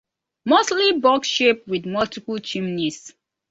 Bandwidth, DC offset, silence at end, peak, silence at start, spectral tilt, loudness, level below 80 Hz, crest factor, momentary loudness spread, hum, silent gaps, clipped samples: 8 kHz; under 0.1%; 0.4 s; -4 dBFS; 0.45 s; -3.5 dB/octave; -20 LUFS; -62 dBFS; 18 dB; 11 LU; none; none; under 0.1%